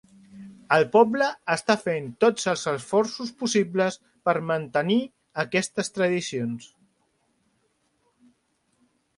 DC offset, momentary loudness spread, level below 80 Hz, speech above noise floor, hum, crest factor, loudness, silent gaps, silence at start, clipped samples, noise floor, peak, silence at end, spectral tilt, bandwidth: under 0.1%; 10 LU; -70 dBFS; 46 dB; none; 22 dB; -24 LUFS; none; 0.35 s; under 0.1%; -70 dBFS; -4 dBFS; 2.5 s; -4.5 dB/octave; 11.5 kHz